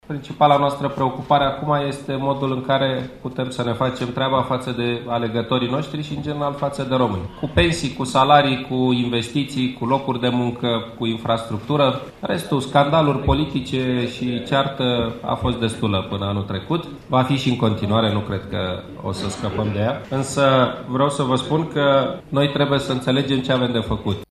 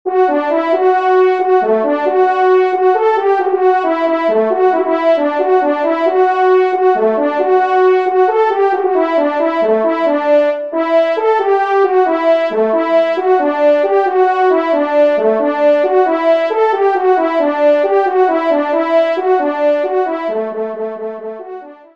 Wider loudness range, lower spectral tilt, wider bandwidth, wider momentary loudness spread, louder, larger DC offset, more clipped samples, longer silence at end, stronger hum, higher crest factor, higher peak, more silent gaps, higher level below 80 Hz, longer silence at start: about the same, 3 LU vs 1 LU; about the same, -6 dB/octave vs -6 dB/octave; first, 13.5 kHz vs 6.2 kHz; first, 8 LU vs 3 LU; second, -21 LUFS vs -13 LUFS; second, under 0.1% vs 0.3%; neither; second, 0.05 s vs 0.2 s; neither; first, 20 dB vs 12 dB; about the same, 0 dBFS vs 0 dBFS; neither; first, -42 dBFS vs -68 dBFS; about the same, 0.1 s vs 0.05 s